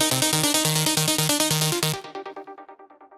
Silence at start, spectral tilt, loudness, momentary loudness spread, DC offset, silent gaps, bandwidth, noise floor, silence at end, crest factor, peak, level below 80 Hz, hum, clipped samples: 0 s; -2.5 dB/octave; -21 LUFS; 17 LU; under 0.1%; none; 17 kHz; -48 dBFS; 0.15 s; 22 dB; -2 dBFS; -62 dBFS; none; under 0.1%